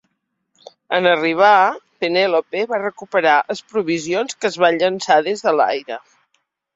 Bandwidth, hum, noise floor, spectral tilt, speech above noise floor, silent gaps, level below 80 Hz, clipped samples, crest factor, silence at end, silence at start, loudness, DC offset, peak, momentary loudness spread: 8 kHz; none; -71 dBFS; -4 dB/octave; 54 dB; none; -68 dBFS; under 0.1%; 18 dB; 0.75 s; 0.9 s; -17 LUFS; under 0.1%; 0 dBFS; 9 LU